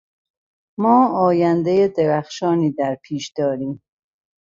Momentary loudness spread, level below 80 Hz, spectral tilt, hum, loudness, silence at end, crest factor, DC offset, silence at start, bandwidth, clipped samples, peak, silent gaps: 12 LU; -62 dBFS; -7 dB/octave; none; -19 LUFS; 0.65 s; 16 dB; under 0.1%; 0.8 s; 7.6 kHz; under 0.1%; -4 dBFS; none